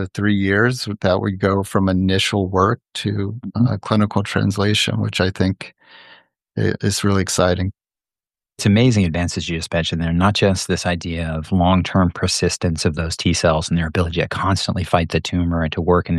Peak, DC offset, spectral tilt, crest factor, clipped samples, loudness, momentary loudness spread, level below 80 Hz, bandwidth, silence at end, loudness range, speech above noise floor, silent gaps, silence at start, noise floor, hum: 0 dBFS; under 0.1%; -5.5 dB/octave; 18 dB; under 0.1%; -19 LUFS; 7 LU; -38 dBFS; 12.5 kHz; 0 s; 2 LU; over 72 dB; none; 0 s; under -90 dBFS; none